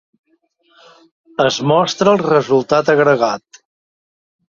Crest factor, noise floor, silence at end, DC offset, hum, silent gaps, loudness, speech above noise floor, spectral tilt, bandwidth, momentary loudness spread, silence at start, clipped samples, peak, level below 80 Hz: 16 dB; -60 dBFS; 1.1 s; under 0.1%; none; none; -14 LUFS; 46 dB; -5 dB/octave; 7.4 kHz; 7 LU; 1.4 s; under 0.1%; -2 dBFS; -58 dBFS